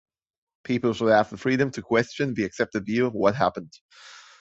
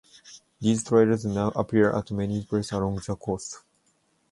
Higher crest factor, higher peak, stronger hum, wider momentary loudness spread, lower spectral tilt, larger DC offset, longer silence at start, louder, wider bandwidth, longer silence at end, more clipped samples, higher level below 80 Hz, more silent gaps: about the same, 20 dB vs 20 dB; first, -4 dBFS vs -8 dBFS; neither; second, 7 LU vs 11 LU; about the same, -6 dB/octave vs -6.5 dB/octave; neither; first, 0.7 s vs 0.25 s; about the same, -24 LUFS vs -26 LUFS; second, 8 kHz vs 11.5 kHz; second, 0.2 s vs 0.75 s; neither; second, -58 dBFS vs -52 dBFS; first, 3.81-3.89 s vs none